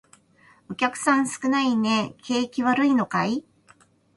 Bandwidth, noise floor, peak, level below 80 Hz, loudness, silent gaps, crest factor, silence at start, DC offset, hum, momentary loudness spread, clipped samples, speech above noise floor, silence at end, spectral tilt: 11.5 kHz; -58 dBFS; -8 dBFS; -66 dBFS; -23 LUFS; none; 18 dB; 0.7 s; under 0.1%; none; 6 LU; under 0.1%; 35 dB; 0.75 s; -4 dB/octave